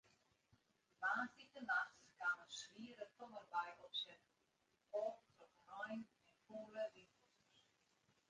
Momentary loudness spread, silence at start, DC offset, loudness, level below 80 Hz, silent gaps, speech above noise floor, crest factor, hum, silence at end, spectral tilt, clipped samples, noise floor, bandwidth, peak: 14 LU; 1 s; under 0.1%; -48 LUFS; under -90 dBFS; none; 35 dB; 20 dB; none; 1.25 s; -2.5 dB/octave; under 0.1%; -84 dBFS; 9.4 kHz; -30 dBFS